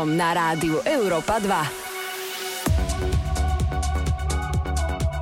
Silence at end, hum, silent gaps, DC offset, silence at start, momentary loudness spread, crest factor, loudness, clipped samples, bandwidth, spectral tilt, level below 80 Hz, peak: 0 s; none; none; under 0.1%; 0 s; 7 LU; 12 dB; -24 LUFS; under 0.1%; 17 kHz; -5 dB/octave; -28 dBFS; -12 dBFS